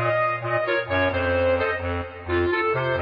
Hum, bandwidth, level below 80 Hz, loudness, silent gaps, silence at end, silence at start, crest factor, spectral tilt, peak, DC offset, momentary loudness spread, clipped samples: none; 5.2 kHz; -44 dBFS; -23 LUFS; none; 0 s; 0 s; 12 dB; -8.5 dB/octave; -12 dBFS; under 0.1%; 5 LU; under 0.1%